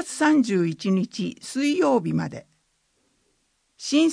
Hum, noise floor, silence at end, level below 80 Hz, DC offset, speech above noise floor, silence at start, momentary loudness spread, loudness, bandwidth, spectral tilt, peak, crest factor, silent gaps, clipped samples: none; -69 dBFS; 0 s; -68 dBFS; under 0.1%; 47 dB; 0 s; 12 LU; -23 LUFS; 10.5 kHz; -5.5 dB/octave; -8 dBFS; 16 dB; none; under 0.1%